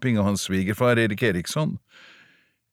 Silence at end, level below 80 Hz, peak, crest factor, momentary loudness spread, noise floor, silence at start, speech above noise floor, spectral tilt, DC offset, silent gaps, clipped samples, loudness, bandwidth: 0.95 s; -56 dBFS; -8 dBFS; 16 dB; 7 LU; -60 dBFS; 0 s; 37 dB; -5.5 dB/octave; under 0.1%; none; under 0.1%; -23 LUFS; 16.5 kHz